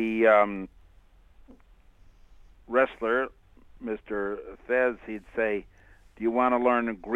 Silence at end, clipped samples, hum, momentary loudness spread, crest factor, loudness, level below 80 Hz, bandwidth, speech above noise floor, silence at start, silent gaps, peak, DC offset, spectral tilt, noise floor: 0 s; under 0.1%; none; 16 LU; 20 dB; -26 LUFS; -56 dBFS; 6.8 kHz; 30 dB; 0 s; none; -8 dBFS; under 0.1%; -7 dB/octave; -56 dBFS